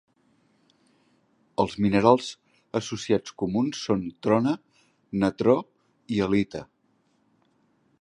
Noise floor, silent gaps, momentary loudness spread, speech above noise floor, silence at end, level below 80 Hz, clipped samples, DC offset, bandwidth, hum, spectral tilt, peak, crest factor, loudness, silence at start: -68 dBFS; none; 12 LU; 44 dB; 1.35 s; -58 dBFS; under 0.1%; under 0.1%; 10.5 kHz; none; -6.5 dB/octave; -2 dBFS; 24 dB; -25 LUFS; 1.6 s